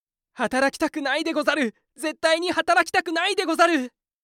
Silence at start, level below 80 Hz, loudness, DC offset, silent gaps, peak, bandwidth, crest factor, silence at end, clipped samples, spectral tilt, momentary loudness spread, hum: 0.4 s; -64 dBFS; -22 LUFS; under 0.1%; none; -6 dBFS; 16.5 kHz; 16 dB; 0.35 s; under 0.1%; -2.5 dB/octave; 9 LU; none